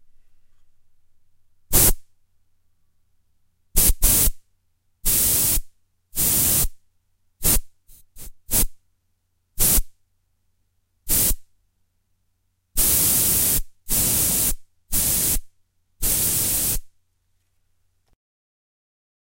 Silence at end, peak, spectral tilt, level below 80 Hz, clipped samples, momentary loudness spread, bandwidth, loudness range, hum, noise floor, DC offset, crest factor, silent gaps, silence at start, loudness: 2.45 s; -2 dBFS; -1.5 dB/octave; -30 dBFS; under 0.1%; 10 LU; 16.5 kHz; 6 LU; none; -69 dBFS; under 0.1%; 22 dB; none; 1.7 s; -19 LUFS